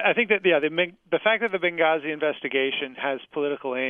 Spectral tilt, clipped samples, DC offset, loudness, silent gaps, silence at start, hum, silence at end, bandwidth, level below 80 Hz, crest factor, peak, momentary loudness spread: -7 dB/octave; under 0.1%; under 0.1%; -24 LUFS; none; 0 s; none; 0 s; 3.9 kHz; -74 dBFS; 18 dB; -6 dBFS; 8 LU